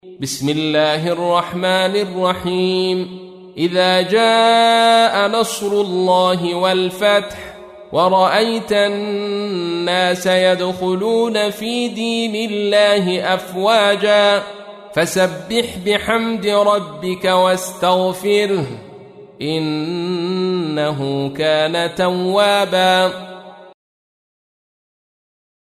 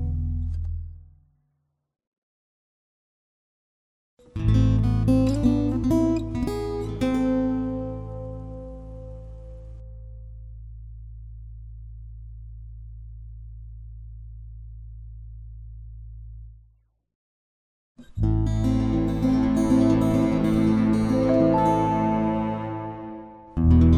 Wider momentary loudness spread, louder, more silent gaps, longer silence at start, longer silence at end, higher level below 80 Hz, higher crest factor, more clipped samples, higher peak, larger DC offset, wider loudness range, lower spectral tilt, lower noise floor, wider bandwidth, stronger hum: second, 8 LU vs 22 LU; first, -16 LUFS vs -23 LUFS; second, none vs 2.07-2.12 s, 2.18-4.17 s, 17.15-17.95 s; about the same, 0.05 s vs 0 s; first, 2.05 s vs 0 s; second, -56 dBFS vs -34 dBFS; about the same, 16 dB vs 18 dB; neither; first, -2 dBFS vs -8 dBFS; neither; second, 5 LU vs 22 LU; second, -4.5 dB/octave vs -8.5 dB/octave; second, -39 dBFS vs -74 dBFS; first, 15.5 kHz vs 12 kHz; neither